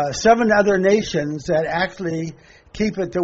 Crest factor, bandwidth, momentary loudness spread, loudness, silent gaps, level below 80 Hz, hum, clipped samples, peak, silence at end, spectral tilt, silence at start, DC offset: 16 dB; 7.8 kHz; 11 LU; -19 LUFS; none; -46 dBFS; none; under 0.1%; -2 dBFS; 0 s; -4.5 dB/octave; 0 s; under 0.1%